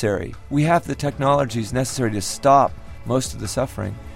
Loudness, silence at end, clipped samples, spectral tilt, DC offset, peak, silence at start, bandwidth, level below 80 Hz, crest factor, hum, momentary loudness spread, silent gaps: -21 LUFS; 0 s; under 0.1%; -5.5 dB/octave; under 0.1%; -4 dBFS; 0 s; 16.5 kHz; -42 dBFS; 18 dB; none; 10 LU; none